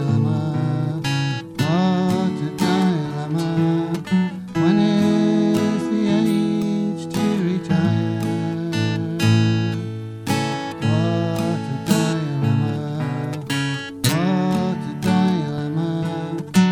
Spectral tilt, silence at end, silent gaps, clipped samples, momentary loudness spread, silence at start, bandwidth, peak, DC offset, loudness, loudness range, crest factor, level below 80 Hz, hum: -6.5 dB/octave; 0 s; none; under 0.1%; 7 LU; 0 s; 16.5 kHz; -4 dBFS; under 0.1%; -21 LUFS; 3 LU; 16 dB; -54 dBFS; none